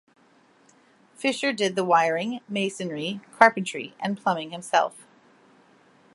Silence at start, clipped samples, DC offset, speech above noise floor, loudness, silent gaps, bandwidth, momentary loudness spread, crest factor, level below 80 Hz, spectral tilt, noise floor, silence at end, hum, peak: 1.2 s; under 0.1%; under 0.1%; 35 dB; -24 LUFS; none; 11.5 kHz; 12 LU; 26 dB; -72 dBFS; -4 dB/octave; -59 dBFS; 1.15 s; none; 0 dBFS